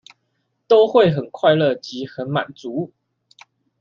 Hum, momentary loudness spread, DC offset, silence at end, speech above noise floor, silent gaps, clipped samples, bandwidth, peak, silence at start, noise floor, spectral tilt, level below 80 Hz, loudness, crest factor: none; 14 LU; under 0.1%; 0.95 s; 53 dB; none; under 0.1%; 7.2 kHz; -2 dBFS; 0.7 s; -71 dBFS; -7 dB/octave; -62 dBFS; -18 LUFS; 18 dB